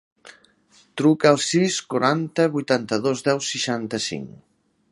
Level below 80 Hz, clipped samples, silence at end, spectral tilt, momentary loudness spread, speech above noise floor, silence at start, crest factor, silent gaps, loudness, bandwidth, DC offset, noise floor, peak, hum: -66 dBFS; under 0.1%; 0.65 s; -4.5 dB/octave; 10 LU; 36 dB; 0.25 s; 22 dB; none; -21 LUFS; 11.5 kHz; under 0.1%; -58 dBFS; -2 dBFS; none